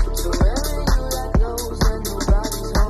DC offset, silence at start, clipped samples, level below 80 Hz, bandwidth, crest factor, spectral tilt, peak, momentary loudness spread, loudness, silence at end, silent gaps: under 0.1%; 0 s; under 0.1%; -20 dBFS; 14 kHz; 14 dB; -5 dB/octave; -4 dBFS; 3 LU; -22 LUFS; 0 s; none